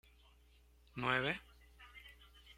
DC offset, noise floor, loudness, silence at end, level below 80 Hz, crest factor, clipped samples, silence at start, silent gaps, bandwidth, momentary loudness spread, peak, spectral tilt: under 0.1%; -67 dBFS; -38 LUFS; 0.05 s; -64 dBFS; 24 dB; under 0.1%; 0.95 s; none; 16 kHz; 24 LU; -20 dBFS; -5.5 dB/octave